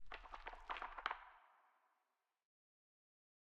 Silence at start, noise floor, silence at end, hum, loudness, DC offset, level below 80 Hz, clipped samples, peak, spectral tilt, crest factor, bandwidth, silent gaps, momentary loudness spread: 0 s; -89 dBFS; 1.05 s; none; -50 LUFS; under 0.1%; -68 dBFS; under 0.1%; -24 dBFS; -3 dB/octave; 30 dB; 8.4 kHz; none; 15 LU